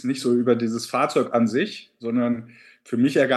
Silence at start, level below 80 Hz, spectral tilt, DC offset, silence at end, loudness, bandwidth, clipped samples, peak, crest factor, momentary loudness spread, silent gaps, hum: 0 s; -74 dBFS; -5.5 dB/octave; under 0.1%; 0 s; -23 LUFS; 12.5 kHz; under 0.1%; -6 dBFS; 16 dB; 9 LU; none; none